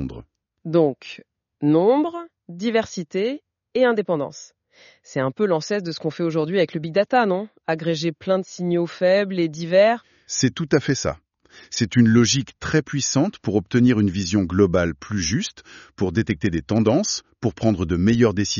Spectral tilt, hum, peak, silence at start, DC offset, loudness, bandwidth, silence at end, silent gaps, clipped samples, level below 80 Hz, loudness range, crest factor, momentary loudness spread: -5.5 dB/octave; none; -4 dBFS; 0 s; under 0.1%; -21 LUFS; 7.4 kHz; 0 s; none; under 0.1%; -48 dBFS; 4 LU; 18 dB; 11 LU